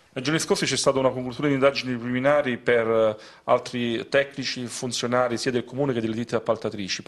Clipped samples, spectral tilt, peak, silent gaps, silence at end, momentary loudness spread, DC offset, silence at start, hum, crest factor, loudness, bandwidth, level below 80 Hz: under 0.1%; -4.5 dB/octave; -6 dBFS; none; 0.05 s; 7 LU; under 0.1%; 0.15 s; none; 18 dB; -24 LUFS; 12.5 kHz; -60 dBFS